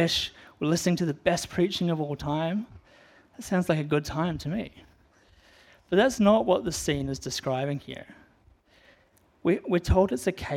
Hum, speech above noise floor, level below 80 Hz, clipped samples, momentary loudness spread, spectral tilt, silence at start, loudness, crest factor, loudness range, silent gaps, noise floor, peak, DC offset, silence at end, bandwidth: none; 37 dB; -46 dBFS; under 0.1%; 11 LU; -5.5 dB/octave; 0 s; -27 LUFS; 20 dB; 4 LU; none; -63 dBFS; -8 dBFS; under 0.1%; 0 s; 16 kHz